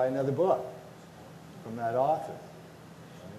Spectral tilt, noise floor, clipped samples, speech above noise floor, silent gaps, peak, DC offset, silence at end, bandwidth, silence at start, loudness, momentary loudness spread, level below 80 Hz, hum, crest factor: -7.5 dB/octave; -49 dBFS; under 0.1%; 20 dB; none; -14 dBFS; under 0.1%; 0 s; 13.5 kHz; 0 s; -30 LUFS; 22 LU; -72 dBFS; none; 18 dB